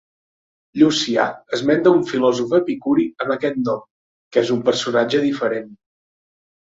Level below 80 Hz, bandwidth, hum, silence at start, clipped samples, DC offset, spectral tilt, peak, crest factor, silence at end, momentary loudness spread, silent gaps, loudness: -62 dBFS; 7.8 kHz; none; 0.75 s; under 0.1%; under 0.1%; -5 dB/octave; -2 dBFS; 18 dB; 0.9 s; 7 LU; 3.91-4.31 s; -19 LUFS